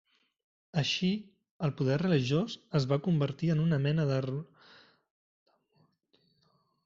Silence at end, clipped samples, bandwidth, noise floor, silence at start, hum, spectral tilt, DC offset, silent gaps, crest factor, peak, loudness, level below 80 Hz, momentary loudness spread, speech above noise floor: 2.4 s; under 0.1%; 7.6 kHz; -72 dBFS; 0.75 s; none; -6 dB/octave; under 0.1%; 1.51-1.60 s; 18 dB; -14 dBFS; -31 LUFS; -64 dBFS; 8 LU; 43 dB